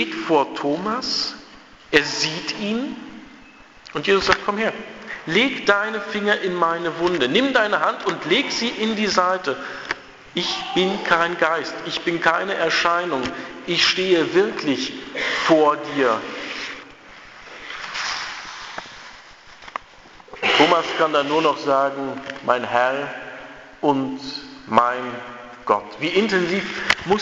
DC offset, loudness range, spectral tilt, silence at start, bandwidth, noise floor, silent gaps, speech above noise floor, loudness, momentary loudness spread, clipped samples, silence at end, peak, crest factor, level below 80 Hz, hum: under 0.1%; 4 LU; -3.5 dB/octave; 0 s; 8 kHz; -46 dBFS; none; 25 dB; -20 LUFS; 16 LU; under 0.1%; 0 s; 0 dBFS; 22 dB; -56 dBFS; none